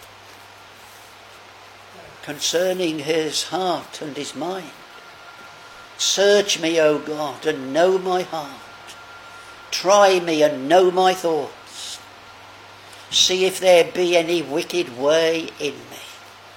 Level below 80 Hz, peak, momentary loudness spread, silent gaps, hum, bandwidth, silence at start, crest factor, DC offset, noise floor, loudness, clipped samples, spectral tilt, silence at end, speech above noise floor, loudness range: -66 dBFS; 0 dBFS; 24 LU; none; none; 17 kHz; 0 s; 20 dB; under 0.1%; -44 dBFS; -19 LUFS; under 0.1%; -2.5 dB/octave; 0.05 s; 24 dB; 6 LU